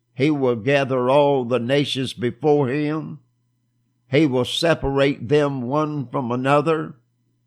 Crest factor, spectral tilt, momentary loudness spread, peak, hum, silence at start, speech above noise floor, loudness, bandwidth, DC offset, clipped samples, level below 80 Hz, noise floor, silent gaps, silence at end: 16 dB; -6.5 dB/octave; 7 LU; -4 dBFS; none; 0.2 s; 48 dB; -20 LUFS; 13 kHz; under 0.1%; under 0.1%; -50 dBFS; -67 dBFS; none; 0.55 s